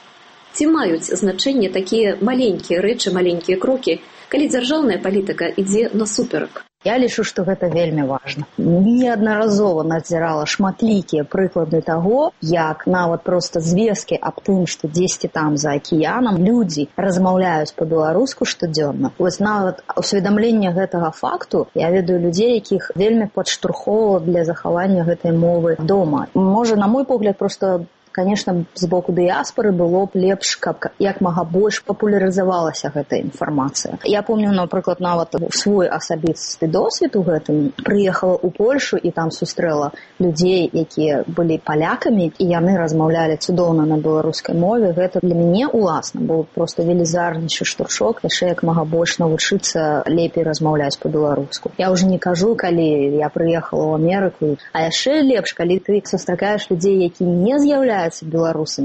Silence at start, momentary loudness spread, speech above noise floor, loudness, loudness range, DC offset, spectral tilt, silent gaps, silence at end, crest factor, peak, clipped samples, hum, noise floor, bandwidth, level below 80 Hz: 0.55 s; 5 LU; 28 dB; -18 LUFS; 2 LU; under 0.1%; -5.5 dB/octave; none; 0 s; 12 dB; -6 dBFS; under 0.1%; none; -45 dBFS; 8.8 kHz; -52 dBFS